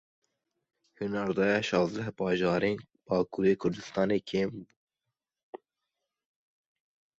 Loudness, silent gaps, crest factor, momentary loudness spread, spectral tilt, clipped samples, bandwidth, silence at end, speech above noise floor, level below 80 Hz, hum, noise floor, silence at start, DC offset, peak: -30 LUFS; 4.77-4.88 s, 5.43-5.53 s; 18 dB; 18 LU; -6.5 dB/octave; under 0.1%; 8 kHz; 1.65 s; 59 dB; -64 dBFS; none; -88 dBFS; 1 s; under 0.1%; -14 dBFS